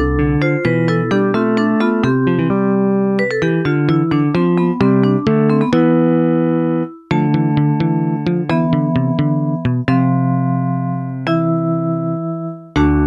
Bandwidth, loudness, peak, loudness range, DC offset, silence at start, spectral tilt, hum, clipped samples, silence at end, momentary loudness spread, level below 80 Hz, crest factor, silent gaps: 7.4 kHz; -16 LUFS; -2 dBFS; 3 LU; under 0.1%; 0 s; -9 dB/octave; none; under 0.1%; 0 s; 5 LU; -34 dBFS; 12 dB; none